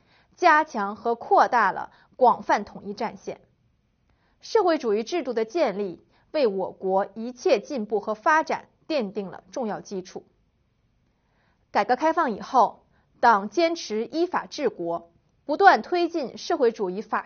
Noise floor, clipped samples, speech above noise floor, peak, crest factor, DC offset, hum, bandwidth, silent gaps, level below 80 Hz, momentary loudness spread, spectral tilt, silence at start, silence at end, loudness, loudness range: -68 dBFS; under 0.1%; 44 dB; -2 dBFS; 24 dB; under 0.1%; none; 6.8 kHz; none; -68 dBFS; 15 LU; -2.5 dB/octave; 0.4 s; 0.05 s; -24 LUFS; 5 LU